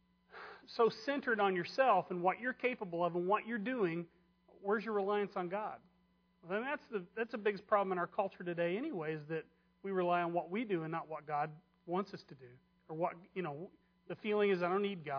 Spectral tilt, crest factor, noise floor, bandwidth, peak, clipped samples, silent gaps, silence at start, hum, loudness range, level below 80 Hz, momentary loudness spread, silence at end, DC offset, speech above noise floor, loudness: -4.5 dB/octave; 20 dB; -74 dBFS; 5.4 kHz; -18 dBFS; under 0.1%; none; 0.35 s; none; 6 LU; -82 dBFS; 14 LU; 0 s; under 0.1%; 37 dB; -37 LUFS